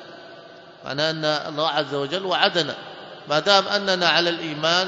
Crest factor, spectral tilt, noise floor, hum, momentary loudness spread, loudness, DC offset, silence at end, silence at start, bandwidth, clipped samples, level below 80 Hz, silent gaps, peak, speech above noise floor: 22 dB; -3.5 dB/octave; -44 dBFS; none; 20 LU; -21 LUFS; under 0.1%; 0 s; 0 s; 7.8 kHz; under 0.1%; -70 dBFS; none; 0 dBFS; 22 dB